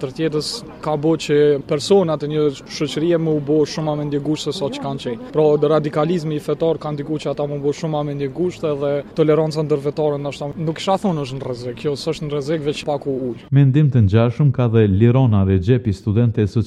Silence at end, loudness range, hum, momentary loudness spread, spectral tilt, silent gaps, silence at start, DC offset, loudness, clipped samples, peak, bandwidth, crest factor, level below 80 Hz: 0 s; 6 LU; none; 9 LU; -7.5 dB/octave; none; 0 s; under 0.1%; -19 LUFS; under 0.1%; -2 dBFS; 12 kHz; 16 dB; -48 dBFS